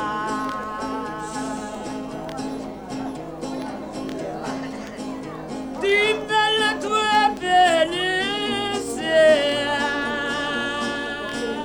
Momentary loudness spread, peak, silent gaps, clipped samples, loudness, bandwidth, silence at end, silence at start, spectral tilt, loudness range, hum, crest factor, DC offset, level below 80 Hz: 15 LU; -6 dBFS; none; under 0.1%; -23 LUFS; over 20 kHz; 0 s; 0 s; -3 dB/octave; 12 LU; none; 18 dB; under 0.1%; -50 dBFS